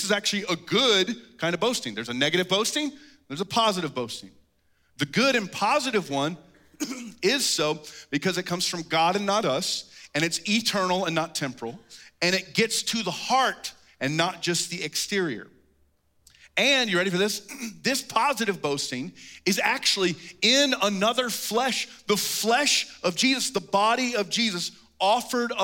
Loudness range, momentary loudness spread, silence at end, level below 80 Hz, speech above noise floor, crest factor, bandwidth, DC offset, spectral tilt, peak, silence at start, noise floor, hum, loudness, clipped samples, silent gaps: 4 LU; 11 LU; 0 s; -70 dBFS; 41 dB; 18 dB; 17 kHz; under 0.1%; -2.5 dB/octave; -8 dBFS; 0 s; -67 dBFS; none; -25 LUFS; under 0.1%; none